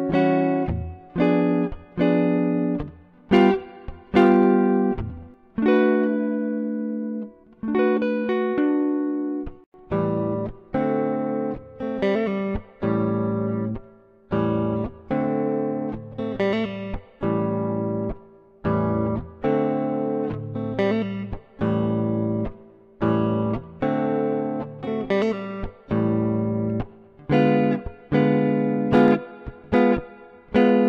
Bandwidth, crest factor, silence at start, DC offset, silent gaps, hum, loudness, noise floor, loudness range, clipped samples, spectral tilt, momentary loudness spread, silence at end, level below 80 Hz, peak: 6.6 kHz; 16 dB; 0 s; under 0.1%; 9.66-9.72 s; none; -23 LUFS; -50 dBFS; 5 LU; under 0.1%; -9.5 dB/octave; 12 LU; 0 s; -44 dBFS; -6 dBFS